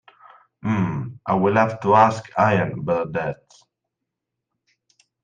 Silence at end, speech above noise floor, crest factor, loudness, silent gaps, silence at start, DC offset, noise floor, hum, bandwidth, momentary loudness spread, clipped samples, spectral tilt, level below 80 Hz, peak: 1.9 s; 62 dB; 20 dB; -21 LUFS; none; 0.65 s; under 0.1%; -82 dBFS; none; 9.2 kHz; 13 LU; under 0.1%; -7.5 dB/octave; -58 dBFS; -2 dBFS